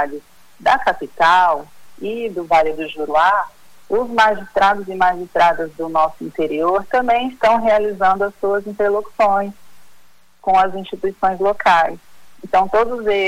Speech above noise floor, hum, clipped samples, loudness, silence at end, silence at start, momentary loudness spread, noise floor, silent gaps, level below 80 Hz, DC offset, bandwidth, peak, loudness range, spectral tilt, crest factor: 33 dB; none; under 0.1%; -17 LUFS; 0 s; 0 s; 10 LU; -50 dBFS; none; -48 dBFS; under 0.1%; 16 kHz; -2 dBFS; 2 LU; -4.5 dB/octave; 14 dB